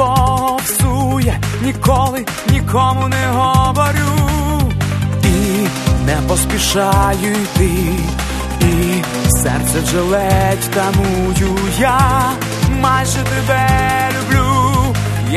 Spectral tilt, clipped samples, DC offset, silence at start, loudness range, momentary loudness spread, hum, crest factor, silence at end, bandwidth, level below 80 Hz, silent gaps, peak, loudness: -5 dB/octave; under 0.1%; under 0.1%; 0 s; 1 LU; 4 LU; none; 14 dB; 0 s; 13.5 kHz; -24 dBFS; none; 0 dBFS; -14 LUFS